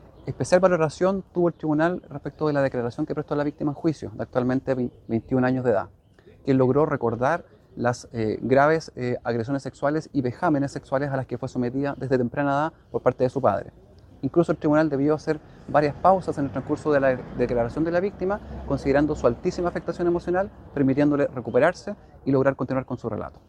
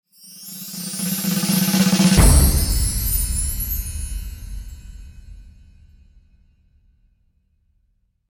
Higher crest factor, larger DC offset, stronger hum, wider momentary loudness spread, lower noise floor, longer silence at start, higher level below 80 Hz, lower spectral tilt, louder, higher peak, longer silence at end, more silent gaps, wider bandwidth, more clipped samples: about the same, 20 dB vs 20 dB; neither; neither; second, 9 LU vs 23 LU; second, -52 dBFS vs -65 dBFS; about the same, 0.25 s vs 0.25 s; second, -48 dBFS vs -24 dBFS; first, -7.5 dB/octave vs -4 dB/octave; second, -24 LUFS vs -19 LUFS; about the same, -4 dBFS vs -2 dBFS; second, 0.2 s vs 2.8 s; neither; second, 10.5 kHz vs 19 kHz; neither